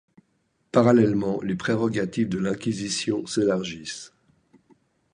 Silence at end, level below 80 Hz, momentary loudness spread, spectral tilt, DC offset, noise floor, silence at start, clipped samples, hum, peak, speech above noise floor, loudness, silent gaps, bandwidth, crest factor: 1.05 s; -58 dBFS; 12 LU; -5.5 dB/octave; under 0.1%; -70 dBFS; 0.75 s; under 0.1%; none; -4 dBFS; 47 dB; -24 LUFS; none; 11 kHz; 22 dB